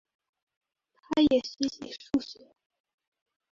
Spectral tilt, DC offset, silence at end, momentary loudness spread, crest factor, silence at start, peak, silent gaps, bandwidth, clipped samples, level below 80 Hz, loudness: -4.5 dB/octave; under 0.1%; 1.2 s; 14 LU; 20 dB; 1.1 s; -12 dBFS; none; 7.4 kHz; under 0.1%; -62 dBFS; -28 LUFS